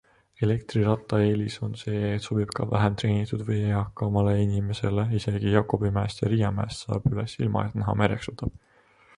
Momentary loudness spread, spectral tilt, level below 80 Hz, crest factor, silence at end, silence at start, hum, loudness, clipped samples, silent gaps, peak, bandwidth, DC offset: 6 LU; -7.5 dB/octave; -46 dBFS; 22 dB; 0.7 s; 0.4 s; none; -26 LUFS; under 0.1%; none; -4 dBFS; 11.5 kHz; under 0.1%